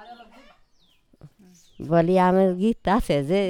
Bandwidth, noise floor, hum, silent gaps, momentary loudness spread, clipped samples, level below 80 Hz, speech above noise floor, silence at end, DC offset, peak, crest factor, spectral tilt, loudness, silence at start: 16 kHz; -60 dBFS; none; none; 5 LU; under 0.1%; -44 dBFS; 40 dB; 0 s; under 0.1%; -6 dBFS; 18 dB; -7.5 dB/octave; -21 LUFS; 0 s